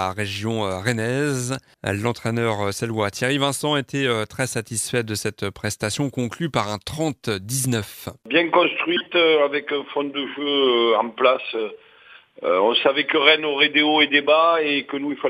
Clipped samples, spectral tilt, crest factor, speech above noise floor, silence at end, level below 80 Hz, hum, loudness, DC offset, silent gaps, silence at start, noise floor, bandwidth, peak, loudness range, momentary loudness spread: under 0.1%; -4 dB/octave; 22 dB; 28 dB; 0 s; -58 dBFS; none; -21 LUFS; under 0.1%; none; 0 s; -49 dBFS; 15.5 kHz; 0 dBFS; 7 LU; 11 LU